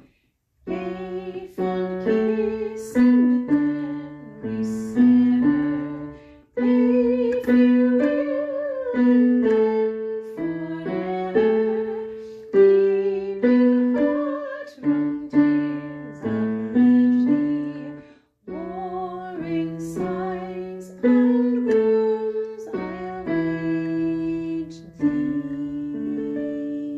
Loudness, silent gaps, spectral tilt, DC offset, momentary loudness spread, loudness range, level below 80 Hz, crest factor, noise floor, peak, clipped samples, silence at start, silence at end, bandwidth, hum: -22 LUFS; none; -8 dB/octave; under 0.1%; 14 LU; 6 LU; -56 dBFS; 16 dB; -67 dBFS; -6 dBFS; under 0.1%; 0.65 s; 0 s; 7.8 kHz; none